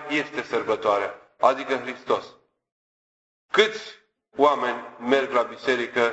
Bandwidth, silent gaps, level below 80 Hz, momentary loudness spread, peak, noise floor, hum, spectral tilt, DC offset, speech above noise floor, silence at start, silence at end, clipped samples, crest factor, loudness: 8.2 kHz; 2.72-3.49 s; -70 dBFS; 9 LU; -4 dBFS; under -90 dBFS; none; -3.5 dB/octave; under 0.1%; over 67 dB; 0 s; 0 s; under 0.1%; 22 dB; -24 LUFS